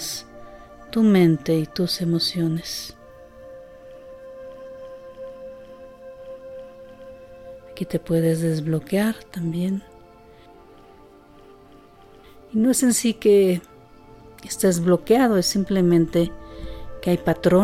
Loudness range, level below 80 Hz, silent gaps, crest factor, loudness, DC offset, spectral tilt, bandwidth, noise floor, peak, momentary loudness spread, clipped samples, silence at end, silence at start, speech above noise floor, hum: 20 LU; -48 dBFS; none; 18 dB; -21 LUFS; under 0.1%; -5.5 dB/octave; 16 kHz; -48 dBFS; -6 dBFS; 25 LU; under 0.1%; 0 s; 0 s; 29 dB; none